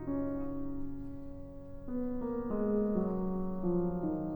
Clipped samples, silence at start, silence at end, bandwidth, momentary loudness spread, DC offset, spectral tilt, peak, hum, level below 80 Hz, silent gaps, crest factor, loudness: under 0.1%; 0 s; 0 s; over 20 kHz; 15 LU; under 0.1%; -12 dB/octave; -20 dBFS; none; -48 dBFS; none; 16 dB; -36 LUFS